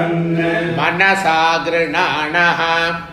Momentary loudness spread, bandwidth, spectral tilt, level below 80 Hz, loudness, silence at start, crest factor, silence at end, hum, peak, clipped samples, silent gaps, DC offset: 4 LU; 13.5 kHz; -5 dB/octave; -50 dBFS; -15 LUFS; 0 s; 16 dB; 0 s; none; 0 dBFS; under 0.1%; none; under 0.1%